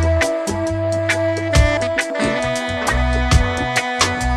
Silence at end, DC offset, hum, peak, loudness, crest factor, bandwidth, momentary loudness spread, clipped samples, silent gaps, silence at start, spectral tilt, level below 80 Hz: 0 s; under 0.1%; none; -2 dBFS; -18 LUFS; 16 dB; 14 kHz; 4 LU; under 0.1%; none; 0 s; -4.5 dB/octave; -24 dBFS